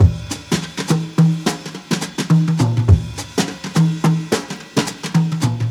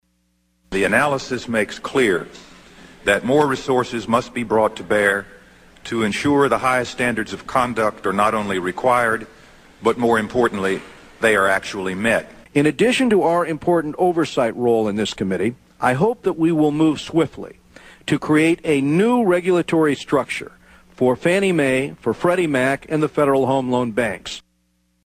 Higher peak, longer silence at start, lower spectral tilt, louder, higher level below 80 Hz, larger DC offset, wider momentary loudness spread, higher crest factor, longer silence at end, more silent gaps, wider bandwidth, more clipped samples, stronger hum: about the same, 0 dBFS vs -2 dBFS; second, 0 s vs 0.7 s; about the same, -6 dB/octave vs -5.5 dB/octave; about the same, -18 LUFS vs -19 LUFS; first, -32 dBFS vs -50 dBFS; neither; about the same, 7 LU vs 8 LU; about the same, 16 dB vs 18 dB; second, 0 s vs 0.65 s; neither; about the same, 14 kHz vs 15 kHz; neither; neither